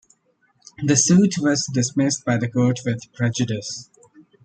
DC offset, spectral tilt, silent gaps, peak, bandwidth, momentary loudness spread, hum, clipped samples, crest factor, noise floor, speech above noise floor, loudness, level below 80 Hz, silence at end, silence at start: under 0.1%; -4.5 dB/octave; none; -4 dBFS; 9.6 kHz; 12 LU; none; under 0.1%; 18 dB; -64 dBFS; 44 dB; -20 LUFS; -60 dBFS; 0.6 s; 0.8 s